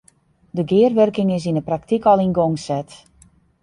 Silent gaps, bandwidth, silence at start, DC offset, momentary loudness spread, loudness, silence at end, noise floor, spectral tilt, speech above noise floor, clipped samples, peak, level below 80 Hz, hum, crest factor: none; 11 kHz; 0.55 s; under 0.1%; 11 LU; -18 LUFS; 0.65 s; -56 dBFS; -7.5 dB/octave; 39 dB; under 0.1%; -2 dBFS; -54 dBFS; none; 16 dB